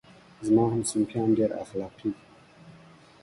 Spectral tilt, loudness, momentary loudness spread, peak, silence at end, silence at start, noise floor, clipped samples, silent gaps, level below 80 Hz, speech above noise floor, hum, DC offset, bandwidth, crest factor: -6.5 dB/octave; -27 LUFS; 13 LU; -12 dBFS; 0.5 s; 0.4 s; -53 dBFS; under 0.1%; none; -60 dBFS; 27 dB; none; under 0.1%; 11.5 kHz; 18 dB